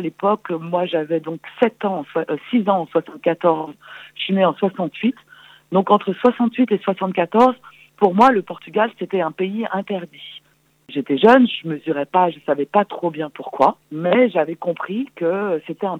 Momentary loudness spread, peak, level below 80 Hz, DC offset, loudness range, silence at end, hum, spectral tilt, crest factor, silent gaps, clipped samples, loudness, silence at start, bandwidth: 13 LU; -2 dBFS; -64 dBFS; under 0.1%; 3 LU; 0 s; none; -7.5 dB/octave; 18 dB; none; under 0.1%; -19 LUFS; 0 s; 8 kHz